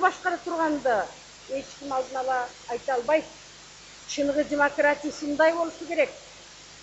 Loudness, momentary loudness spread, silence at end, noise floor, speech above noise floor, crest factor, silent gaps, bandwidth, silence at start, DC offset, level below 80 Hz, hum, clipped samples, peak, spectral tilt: -27 LUFS; 22 LU; 0 s; -47 dBFS; 21 dB; 20 dB; none; 8.2 kHz; 0 s; under 0.1%; -62 dBFS; 50 Hz at -60 dBFS; under 0.1%; -8 dBFS; -3 dB/octave